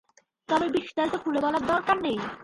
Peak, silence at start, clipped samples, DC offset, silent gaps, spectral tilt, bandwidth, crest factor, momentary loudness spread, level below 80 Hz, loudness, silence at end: -10 dBFS; 0.5 s; under 0.1%; under 0.1%; none; -5 dB/octave; 11.5 kHz; 16 dB; 4 LU; -60 dBFS; -26 LUFS; 0 s